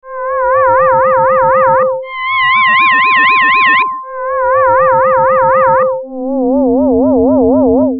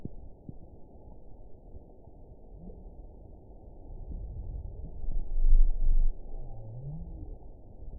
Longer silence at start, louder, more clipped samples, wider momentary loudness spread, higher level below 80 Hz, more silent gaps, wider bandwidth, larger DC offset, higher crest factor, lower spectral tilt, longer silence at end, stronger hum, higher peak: about the same, 0.05 s vs 0 s; first, -9 LUFS vs -37 LUFS; neither; second, 8 LU vs 22 LU; second, -40 dBFS vs -30 dBFS; neither; first, 5 kHz vs 0.9 kHz; second, under 0.1% vs 0.1%; second, 10 dB vs 18 dB; second, -2 dB/octave vs -16 dB/octave; about the same, 0 s vs 0 s; neither; first, 0 dBFS vs -10 dBFS